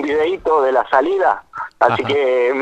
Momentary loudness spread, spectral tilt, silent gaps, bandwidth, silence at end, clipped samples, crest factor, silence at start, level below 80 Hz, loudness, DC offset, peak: 3 LU; -6 dB/octave; none; 8.6 kHz; 0 s; under 0.1%; 16 dB; 0 s; -52 dBFS; -16 LUFS; under 0.1%; 0 dBFS